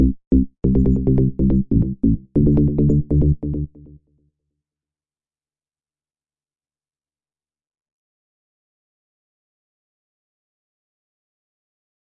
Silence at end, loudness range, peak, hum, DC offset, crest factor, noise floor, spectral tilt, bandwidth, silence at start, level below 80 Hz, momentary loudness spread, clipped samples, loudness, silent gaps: 8.4 s; 10 LU; -4 dBFS; none; under 0.1%; 18 dB; under -90 dBFS; -14 dB/octave; 2.2 kHz; 0 s; -30 dBFS; 5 LU; under 0.1%; -18 LUFS; 0.27-0.31 s